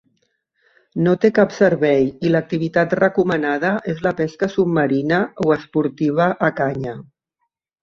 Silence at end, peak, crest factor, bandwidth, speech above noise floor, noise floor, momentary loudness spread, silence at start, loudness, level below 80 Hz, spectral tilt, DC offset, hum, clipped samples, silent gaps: 0.8 s; -2 dBFS; 18 dB; 7.4 kHz; 57 dB; -75 dBFS; 7 LU; 0.95 s; -18 LUFS; -56 dBFS; -7.5 dB/octave; under 0.1%; none; under 0.1%; none